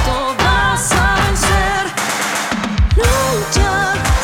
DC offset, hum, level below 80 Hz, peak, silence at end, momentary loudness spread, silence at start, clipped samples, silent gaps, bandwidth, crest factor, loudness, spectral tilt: under 0.1%; none; -20 dBFS; 0 dBFS; 0 s; 4 LU; 0 s; under 0.1%; none; 18 kHz; 14 dB; -15 LUFS; -3.5 dB/octave